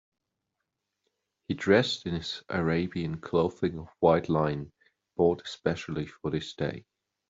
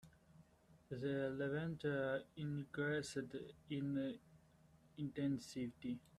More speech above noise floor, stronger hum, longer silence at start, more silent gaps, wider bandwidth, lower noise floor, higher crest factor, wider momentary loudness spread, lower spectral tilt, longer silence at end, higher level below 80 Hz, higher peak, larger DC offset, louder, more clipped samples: first, 56 dB vs 26 dB; neither; first, 1.5 s vs 0.05 s; neither; second, 7.8 kHz vs 13 kHz; first, -84 dBFS vs -70 dBFS; about the same, 20 dB vs 16 dB; about the same, 11 LU vs 9 LU; about the same, -6.5 dB/octave vs -6.5 dB/octave; first, 0.5 s vs 0.2 s; first, -58 dBFS vs -76 dBFS; first, -8 dBFS vs -28 dBFS; neither; first, -29 LUFS vs -44 LUFS; neither